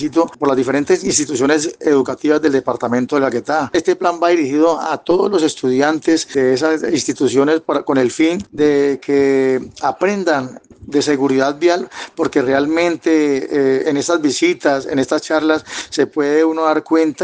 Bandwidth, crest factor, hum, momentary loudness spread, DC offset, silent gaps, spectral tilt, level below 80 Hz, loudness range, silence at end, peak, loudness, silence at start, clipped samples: 9.8 kHz; 14 dB; none; 4 LU; under 0.1%; none; -4 dB/octave; -56 dBFS; 1 LU; 0 s; -2 dBFS; -16 LUFS; 0 s; under 0.1%